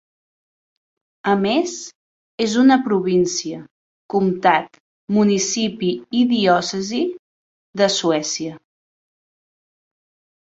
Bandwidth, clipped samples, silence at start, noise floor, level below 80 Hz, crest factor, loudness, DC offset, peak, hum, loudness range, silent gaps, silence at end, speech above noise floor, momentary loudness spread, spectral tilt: 8 kHz; under 0.1%; 1.25 s; under -90 dBFS; -62 dBFS; 20 dB; -19 LUFS; under 0.1%; -2 dBFS; none; 5 LU; 1.95-2.38 s, 3.71-4.09 s, 4.80-5.08 s, 7.19-7.73 s; 1.85 s; over 72 dB; 16 LU; -4 dB/octave